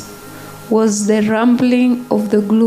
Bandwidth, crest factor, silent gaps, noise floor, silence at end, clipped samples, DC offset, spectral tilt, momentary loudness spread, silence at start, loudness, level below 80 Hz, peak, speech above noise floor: 15.5 kHz; 12 dB; none; -33 dBFS; 0 s; under 0.1%; under 0.1%; -5.5 dB/octave; 20 LU; 0 s; -14 LUFS; -56 dBFS; -2 dBFS; 20 dB